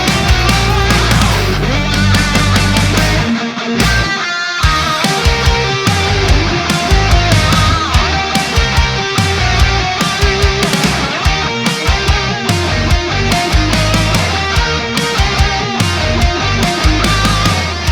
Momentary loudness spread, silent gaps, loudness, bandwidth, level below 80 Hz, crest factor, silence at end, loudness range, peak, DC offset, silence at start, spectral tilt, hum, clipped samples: 3 LU; none; -12 LUFS; 19.5 kHz; -18 dBFS; 12 dB; 0 s; 1 LU; 0 dBFS; under 0.1%; 0 s; -4 dB/octave; none; under 0.1%